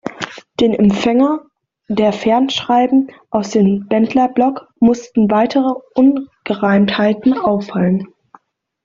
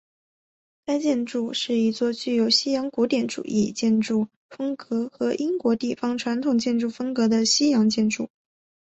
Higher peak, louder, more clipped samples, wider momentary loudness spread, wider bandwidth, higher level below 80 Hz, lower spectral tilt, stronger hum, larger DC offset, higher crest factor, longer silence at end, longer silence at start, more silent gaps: first, -2 dBFS vs -8 dBFS; first, -15 LUFS vs -23 LUFS; neither; about the same, 8 LU vs 9 LU; about the same, 7.6 kHz vs 8.2 kHz; first, -52 dBFS vs -66 dBFS; first, -6.5 dB/octave vs -4 dB/octave; neither; neither; about the same, 12 dB vs 16 dB; first, 0.8 s vs 0.6 s; second, 0.05 s vs 0.9 s; second, none vs 4.36-4.49 s